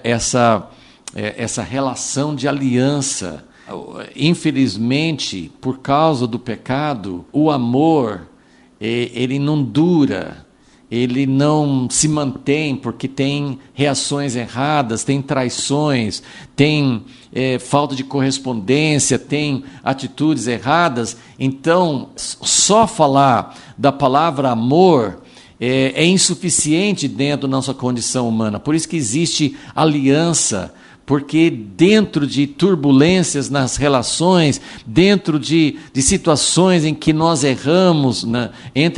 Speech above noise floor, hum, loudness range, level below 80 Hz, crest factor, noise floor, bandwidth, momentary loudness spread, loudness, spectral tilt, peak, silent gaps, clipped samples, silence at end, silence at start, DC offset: 33 dB; none; 4 LU; -46 dBFS; 16 dB; -49 dBFS; 11.5 kHz; 11 LU; -16 LUFS; -4.5 dB/octave; 0 dBFS; none; under 0.1%; 0 s; 0.05 s; under 0.1%